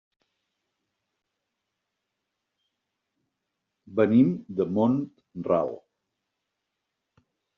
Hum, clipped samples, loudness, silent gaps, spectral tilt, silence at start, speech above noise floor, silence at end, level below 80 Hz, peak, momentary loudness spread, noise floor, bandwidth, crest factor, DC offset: 50 Hz at -65 dBFS; under 0.1%; -25 LUFS; none; -8.5 dB/octave; 3.9 s; 59 dB; 1.8 s; -70 dBFS; -8 dBFS; 16 LU; -83 dBFS; 4.1 kHz; 22 dB; under 0.1%